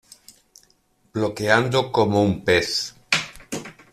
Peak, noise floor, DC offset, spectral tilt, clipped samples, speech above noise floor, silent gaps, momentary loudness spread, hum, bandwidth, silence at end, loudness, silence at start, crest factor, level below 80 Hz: -2 dBFS; -62 dBFS; under 0.1%; -4.5 dB/octave; under 0.1%; 42 dB; none; 14 LU; none; 14.5 kHz; 0.2 s; -21 LUFS; 1.15 s; 20 dB; -54 dBFS